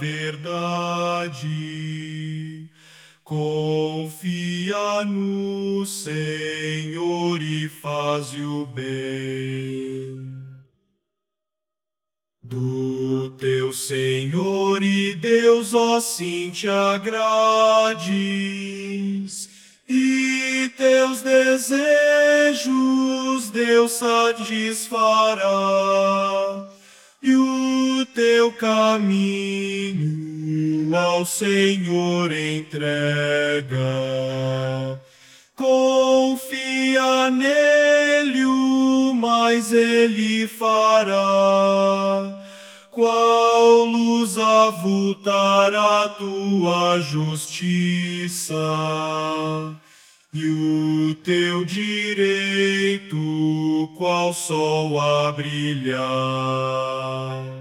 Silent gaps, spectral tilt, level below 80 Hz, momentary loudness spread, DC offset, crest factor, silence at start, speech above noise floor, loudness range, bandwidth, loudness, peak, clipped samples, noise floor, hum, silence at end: none; -4.5 dB/octave; -70 dBFS; 12 LU; under 0.1%; 18 dB; 0 s; 69 dB; 9 LU; 18 kHz; -20 LUFS; -2 dBFS; under 0.1%; -89 dBFS; none; 0 s